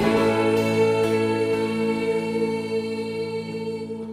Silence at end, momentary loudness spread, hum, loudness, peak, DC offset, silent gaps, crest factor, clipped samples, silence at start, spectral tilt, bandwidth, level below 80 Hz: 0 s; 9 LU; none; -23 LUFS; -8 dBFS; under 0.1%; none; 16 dB; under 0.1%; 0 s; -6 dB/octave; 15.5 kHz; -56 dBFS